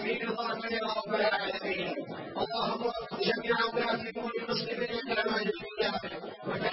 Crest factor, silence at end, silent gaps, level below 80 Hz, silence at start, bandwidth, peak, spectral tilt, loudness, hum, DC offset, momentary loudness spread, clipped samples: 16 dB; 0 s; none; -64 dBFS; 0 s; 5.8 kHz; -16 dBFS; -8 dB/octave; -32 LUFS; none; under 0.1%; 7 LU; under 0.1%